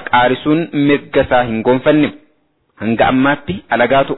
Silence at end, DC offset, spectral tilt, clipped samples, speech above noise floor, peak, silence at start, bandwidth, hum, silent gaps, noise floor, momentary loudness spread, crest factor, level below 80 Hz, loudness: 0 s; under 0.1%; -10 dB/octave; under 0.1%; 46 dB; -2 dBFS; 0 s; 4.1 kHz; none; none; -59 dBFS; 7 LU; 12 dB; -42 dBFS; -14 LUFS